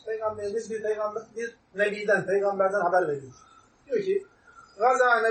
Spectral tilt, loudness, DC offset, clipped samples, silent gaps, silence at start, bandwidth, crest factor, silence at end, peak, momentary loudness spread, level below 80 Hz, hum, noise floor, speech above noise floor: -4.5 dB/octave; -27 LUFS; under 0.1%; under 0.1%; none; 0.05 s; 8.8 kHz; 18 dB; 0 s; -10 dBFS; 12 LU; -70 dBFS; none; -53 dBFS; 27 dB